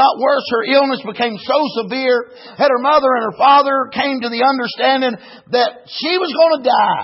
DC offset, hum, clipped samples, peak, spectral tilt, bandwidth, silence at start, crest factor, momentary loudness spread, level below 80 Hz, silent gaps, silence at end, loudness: under 0.1%; none; under 0.1%; -2 dBFS; -7 dB/octave; 6 kHz; 0 s; 14 dB; 8 LU; -62 dBFS; none; 0 s; -15 LUFS